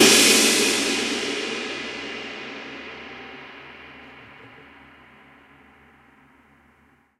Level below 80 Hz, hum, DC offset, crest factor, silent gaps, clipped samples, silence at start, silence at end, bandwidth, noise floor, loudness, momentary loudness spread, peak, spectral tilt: -62 dBFS; none; under 0.1%; 24 dB; none; under 0.1%; 0 s; 2.75 s; 16 kHz; -59 dBFS; -19 LUFS; 27 LU; -2 dBFS; -0.5 dB/octave